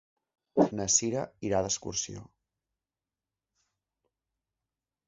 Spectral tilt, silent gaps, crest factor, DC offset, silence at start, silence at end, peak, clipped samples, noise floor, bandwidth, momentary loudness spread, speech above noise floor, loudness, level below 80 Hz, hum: -5 dB/octave; none; 24 dB; under 0.1%; 0.55 s; 2.85 s; -10 dBFS; under 0.1%; under -90 dBFS; 7.6 kHz; 10 LU; over 60 dB; -29 LUFS; -60 dBFS; none